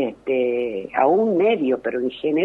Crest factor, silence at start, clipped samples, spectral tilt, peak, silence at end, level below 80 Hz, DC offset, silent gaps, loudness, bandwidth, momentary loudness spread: 14 dB; 0 s; under 0.1%; -8 dB/octave; -6 dBFS; 0 s; -60 dBFS; under 0.1%; none; -21 LUFS; 4.3 kHz; 7 LU